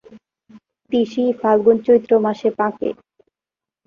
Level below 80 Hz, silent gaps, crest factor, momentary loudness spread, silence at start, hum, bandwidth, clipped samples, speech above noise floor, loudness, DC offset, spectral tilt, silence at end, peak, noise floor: -62 dBFS; none; 16 dB; 11 LU; 0.15 s; none; 6.8 kHz; under 0.1%; 72 dB; -18 LUFS; under 0.1%; -7.5 dB/octave; 0.95 s; -2 dBFS; -89 dBFS